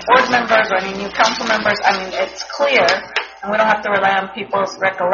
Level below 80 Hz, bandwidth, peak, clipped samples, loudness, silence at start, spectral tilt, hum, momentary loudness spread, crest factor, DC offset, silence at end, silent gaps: -52 dBFS; 7.2 kHz; 0 dBFS; under 0.1%; -16 LUFS; 0 s; -0.5 dB/octave; none; 9 LU; 16 dB; under 0.1%; 0 s; none